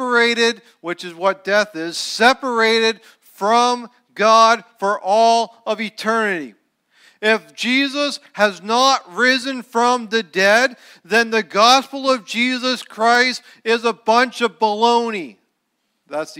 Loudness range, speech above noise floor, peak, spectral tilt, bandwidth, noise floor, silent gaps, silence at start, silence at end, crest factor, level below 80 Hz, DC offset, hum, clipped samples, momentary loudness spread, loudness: 3 LU; 53 dB; 0 dBFS; -2.5 dB/octave; 16 kHz; -71 dBFS; none; 0 s; 0 s; 16 dB; -72 dBFS; under 0.1%; none; under 0.1%; 10 LU; -17 LUFS